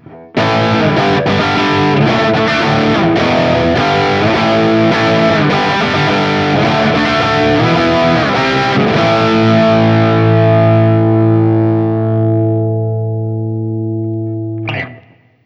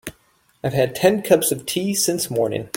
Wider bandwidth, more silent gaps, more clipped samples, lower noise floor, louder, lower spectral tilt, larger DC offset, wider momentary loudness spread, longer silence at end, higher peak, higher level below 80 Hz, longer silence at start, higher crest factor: second, 7.4 kHz vs 17 kHz; neither; neither; second, -43 dBFS vs -60 dBFS; first, -12 LUFS vs -20 LUFS; first, -7 dB/octave vs -4 dB/octave; neither; about the same, 9 LU vs 7 LU; first, 0.45 s vs 0.1 s; about the same, 0 dBFS vs -2 dBFS; first, -40 dBFS vs -56 dBFS; about the same, 0.1 s vs 0.05 s; second, 10 dB vs 20 dB